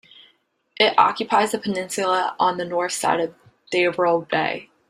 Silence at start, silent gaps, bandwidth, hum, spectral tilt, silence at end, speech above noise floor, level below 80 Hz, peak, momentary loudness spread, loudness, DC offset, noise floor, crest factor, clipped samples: 0.8 s; none; 16 kHz; none; -3 dB/octave; 0.25 s; 42 dB; -68 dBFS; 0 dBFS; 8 LU; -21 LUFS; under 0.1%; -63 dBFS; 22 dB; under 0.1%